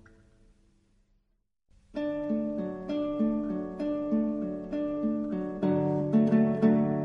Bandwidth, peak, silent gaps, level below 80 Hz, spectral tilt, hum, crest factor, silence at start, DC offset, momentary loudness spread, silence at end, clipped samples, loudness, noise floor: 5.4 kHz; -12 dBFS; none; -58 dBFS; -10 dB/octave; none; 16 dB; 1.95 s; under 0.1%; 10 LU; 0 s; under 0.1%; -29 LUFS; -75 dBFS